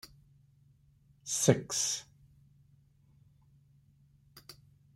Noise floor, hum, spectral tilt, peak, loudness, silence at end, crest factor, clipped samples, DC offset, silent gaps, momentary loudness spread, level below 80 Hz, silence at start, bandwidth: -66 dBFS; none; -3.5 dB/octave; -8 dBFS; -30 LUFS; 0.45 s; 30 dB; under 0.1%; under 0.1%; none; 27 LU; -70 dBFS; 1.25 s; 16 kHz